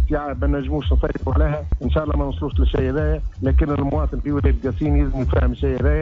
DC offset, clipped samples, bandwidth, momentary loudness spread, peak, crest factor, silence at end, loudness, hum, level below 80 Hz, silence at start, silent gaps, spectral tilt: under 0.1%; under 0.1%; 4 kHz; 3 LU; -6 dBFS; 14 dB; 0 s; -21 LUFS; none; -22 dBFS; 0 s; none; -9.5 dB/octave